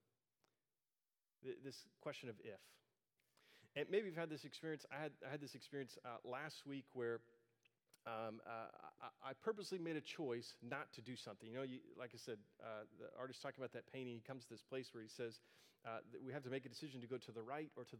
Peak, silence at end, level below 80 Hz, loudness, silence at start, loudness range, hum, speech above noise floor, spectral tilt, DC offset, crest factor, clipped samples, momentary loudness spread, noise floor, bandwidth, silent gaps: -28 dBFS; 0 s; under -90 dBFS; -51 LUFS; 1.4 s; 4 LU; none; over 39 dB; -5 dB/octave; under 0.1%; 24 dB; under 0.1%; 9 LU; under -90 dBFS; 16 kHz; none